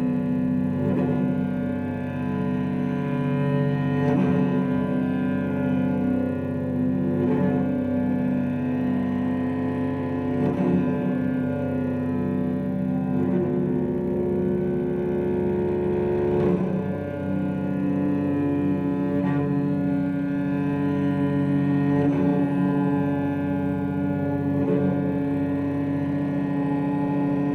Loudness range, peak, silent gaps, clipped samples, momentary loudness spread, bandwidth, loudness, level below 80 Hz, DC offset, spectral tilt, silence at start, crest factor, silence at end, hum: 2 LU; -10 dBFS; none; under 0.1%; 4 LU; 4.5 kHz; -24 LUFS; -52 dBFS; under 0.1%; -10 dB/octave; 0 s; 12 dB; 0 s; none